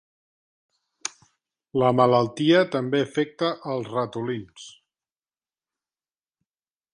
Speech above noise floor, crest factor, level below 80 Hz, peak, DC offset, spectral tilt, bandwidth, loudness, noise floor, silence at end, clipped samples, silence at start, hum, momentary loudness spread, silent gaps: over 67 dB; 22 dB; -68 dBFS; -4 dBFS; under 0.1%; -5.5 dB/octave; 11 kHz; -23 LUFS; under -90 dBFS; 2.25 s; under 0.1%; 1.05 s; none; 16 LU; none